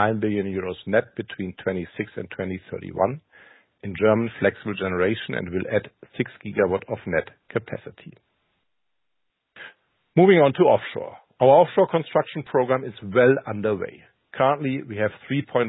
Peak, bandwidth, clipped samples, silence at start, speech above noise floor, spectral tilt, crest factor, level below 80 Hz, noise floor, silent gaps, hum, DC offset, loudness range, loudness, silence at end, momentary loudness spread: -4 dBFS; 4 kHz; under 0.1%; 0 s; 60 dB; -11.5 dB/octave; 20 dB; -54 dBFS; -82 dBFS; none; none; under 0.1%; 9 LU; -23 LUFS; 0 s; 18 LU